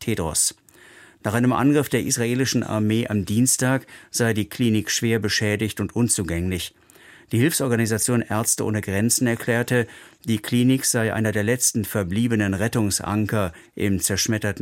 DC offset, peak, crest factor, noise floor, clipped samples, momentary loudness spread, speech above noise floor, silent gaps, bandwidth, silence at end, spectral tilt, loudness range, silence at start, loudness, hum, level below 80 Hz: under 0.1%; -6 dBFS; 16 dB; -49 dBFS; under 0.1%; 7 LU; 27 dB; none; 16.5 kHz; 0 s; -4.5 dB/octave; 2 LU; 0 s; -22 LUFS; none; -50 dBFS